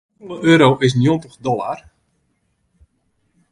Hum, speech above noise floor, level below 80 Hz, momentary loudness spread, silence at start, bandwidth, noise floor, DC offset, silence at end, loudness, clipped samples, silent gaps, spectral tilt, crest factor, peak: none; 51 dB; -54 dBFS; 17 LU; 0.25 s; 11 kHz; -66 dBFS; under 0.1%; 1.75 s; -16 LUFS; under 0.1%; none; -6.5 dB/octave; 18 dB; 0 dBFS